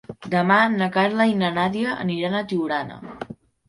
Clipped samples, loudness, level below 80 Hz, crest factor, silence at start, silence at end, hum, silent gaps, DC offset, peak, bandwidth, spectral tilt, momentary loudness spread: under 0.1%; -21 LUFS; -60 dBFS; 18 dB; 0.1 s; 0.35 s; none; none; under 0.1%; -4 dBFS; 11.5 kHz; -7 dB/octave; 18 LU